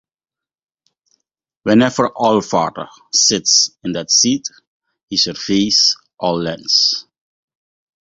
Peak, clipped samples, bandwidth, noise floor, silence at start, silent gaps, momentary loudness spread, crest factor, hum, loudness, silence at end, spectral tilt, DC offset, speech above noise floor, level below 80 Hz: 0 dBFS; under 0.1%; 7.8 kHz; -89 dBFS; 1.65 s; 4.67-4.80 s, 5.03-5.08 s; 11 LU; 18 dB; none; -14 LUFS; 1 s; -2.5 dB/octave; under 0.1%; 73 dB; -56 dBFS